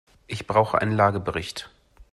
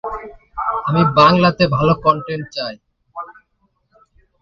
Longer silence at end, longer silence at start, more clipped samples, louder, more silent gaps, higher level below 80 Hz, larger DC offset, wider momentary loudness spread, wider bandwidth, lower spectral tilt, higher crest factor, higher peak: second, 0.45 s vs 1.1 s; first, 0.3 s vs 0.05 s; neither; second, -23 LUFS vs -15 LUFS; neither; second, -52 dBFS vs -44 dBFS; neither; second, 15 LU vs 22 LU; first, 12.5 kHz vs 7 kHz; second, -6 dB/octave vs -7.5 dB/octave; about the same, 20 dB vs 18 dB; second, -6 dBFS vs 0 dBFS